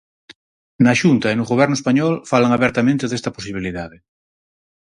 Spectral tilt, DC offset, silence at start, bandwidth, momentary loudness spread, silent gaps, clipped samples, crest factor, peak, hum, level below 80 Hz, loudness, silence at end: -6 dB/octave; under 0.1%; 0.8 s; 11 kHz; 12 LU; none; under 0.1%; 18 dB; 0 dBFS; none; -50 dBFS; -17 LUFS; 1 s